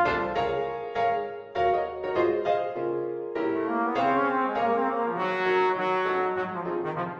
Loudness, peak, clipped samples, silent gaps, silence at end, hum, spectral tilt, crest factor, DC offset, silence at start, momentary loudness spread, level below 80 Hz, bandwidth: -27 LUFS; -12 dBFS; under 0.1%; none; 0 s; none; -7 dB/octave; 14 dB; under 0.1%; 0 s; 6 LU; -58 dBFS; 7.4 kHz